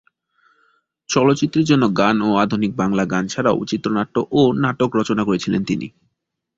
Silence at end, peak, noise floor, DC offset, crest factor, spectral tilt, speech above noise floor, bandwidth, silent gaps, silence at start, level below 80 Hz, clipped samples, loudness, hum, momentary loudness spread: 0.7 s; -2 dBFS; -75 dBFS; under 0.1%; 18 dB; -6 dB/octave; 57 dB; 7.8 kHz; none; 1.1 s; -52 dBFS; under 0.1%; -18 LUFS; none; 5 LU